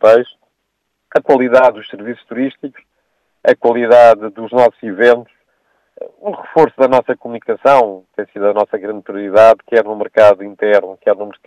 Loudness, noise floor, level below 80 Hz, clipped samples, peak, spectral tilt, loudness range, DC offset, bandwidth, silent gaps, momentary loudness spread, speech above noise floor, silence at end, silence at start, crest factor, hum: -12 LUFS; -70 dBFS; -58 dBFS; 0.6%; 0 dBFS; -6 dB/octave; 3 LU; under 0.1%; 9.4 kHz; none; 17 LU; 58 dB; 0.15 s; 0.05 s; 12 dB; none